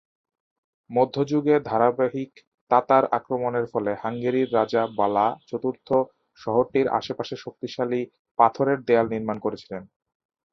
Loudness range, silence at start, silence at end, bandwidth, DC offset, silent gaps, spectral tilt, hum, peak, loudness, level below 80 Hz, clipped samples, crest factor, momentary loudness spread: 2 LU; 0.9 s; 0.7 s; 6.4 kHz; under 0.1%; 2.47-2.52 s, 2.61-2.67 s, 8.19-8.25 s, 8.31-8.35 s; -7.5 dB/octave; none; -2 dBFS; -24 LUFS; -64 dBFS; under 0.1%; 22 dB; 13 LU